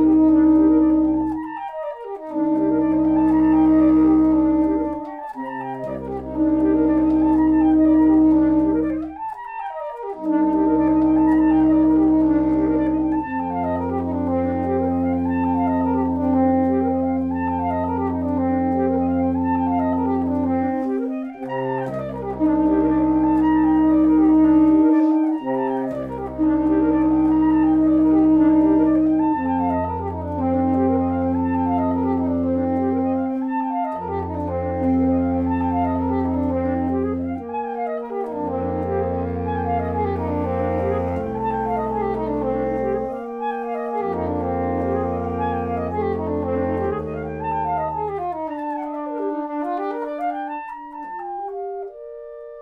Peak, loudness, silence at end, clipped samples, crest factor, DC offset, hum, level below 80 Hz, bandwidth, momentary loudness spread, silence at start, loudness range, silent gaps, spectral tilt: -6 dBFS; -20 LUFS; 0 s; under 0.1%; 12 dB; under 0.1%; none; -42 dBFS; 3.6 kHz; 13 LU; 0 s; 7 LU; none; -10.5 dB/octave